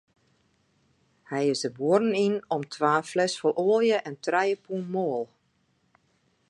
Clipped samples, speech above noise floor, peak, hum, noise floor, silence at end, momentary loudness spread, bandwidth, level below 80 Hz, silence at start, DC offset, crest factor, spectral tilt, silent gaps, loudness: under 0.1%; 45 dB; -8 dBFS; none; -70 dBFS; 1.25 s; 9 LU; 11.5 kHz; -78 dBFS; 1.3 s; under 0.1%; 20 dB; -5 dB/octave; none; -26 LUFS